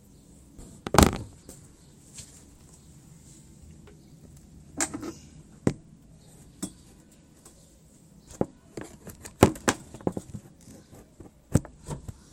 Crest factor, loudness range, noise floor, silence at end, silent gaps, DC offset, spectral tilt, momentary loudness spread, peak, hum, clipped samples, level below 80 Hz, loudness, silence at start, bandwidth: 32 dB; 12 LU; -55 dBFS; 0.2 s; none; under 0.1%; -4.5 dB/octave; 28 LU; 0 dBFS; none; under 0.1%; -42 dBFS; -28 LUFS; 0.6 s; 16.5 kHz